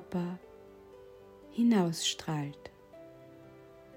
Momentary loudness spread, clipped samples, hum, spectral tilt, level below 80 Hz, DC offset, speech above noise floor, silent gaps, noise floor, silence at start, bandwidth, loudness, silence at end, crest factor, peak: 26 LU; under 0.1%; none; -5 dB/octave; -68 dBFS; under 0.1%; 23 dB; none; -54 dBFS; 0 s; 16 kHz; -32 LUFS; 0 s; 18 dB; -18 dBFS